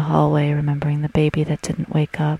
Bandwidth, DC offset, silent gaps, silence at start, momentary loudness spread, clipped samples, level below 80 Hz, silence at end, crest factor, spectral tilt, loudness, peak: 11 kHz; under 0.1%; none; 0 s; 5 LU; under 0.1%; -44 dBFS; 0 s; 16 dB; -7.5 dB/octave; -20 LUFS; -4 dBFS